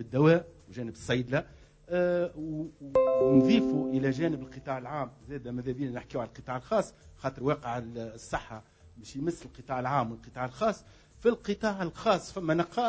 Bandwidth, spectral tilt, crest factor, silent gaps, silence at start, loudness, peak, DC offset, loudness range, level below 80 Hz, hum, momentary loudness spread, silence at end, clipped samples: 8 kHz; -7 dB/octave; 20 dB; none; 0 s; -30 LUFS; -10 dBFS; under 0.1%; 7 LU; -56 dBFS; none; 16 LU; 0 s; under 0.1%